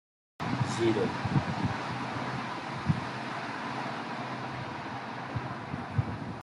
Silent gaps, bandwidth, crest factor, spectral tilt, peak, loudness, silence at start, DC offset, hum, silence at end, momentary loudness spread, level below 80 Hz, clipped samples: none; 11.5 kHz; 20 dB; -6 dB/octave; -14 dBFS; -33 LUFS; 0.4 s; under 0.1%; none; 0 s; 9 LU; -58 dBFS; under 0.1%